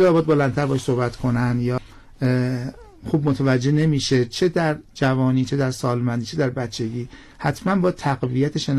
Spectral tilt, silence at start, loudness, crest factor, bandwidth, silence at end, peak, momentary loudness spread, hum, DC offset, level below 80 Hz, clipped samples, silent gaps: -6.5 dB/octave; 0 s; -21 LUFS; 10 dB; 12.5 kHz; 0 s; -10 dBFS; 8 LU; none; under 0.1%; -46 dBFS; under 0.1%; none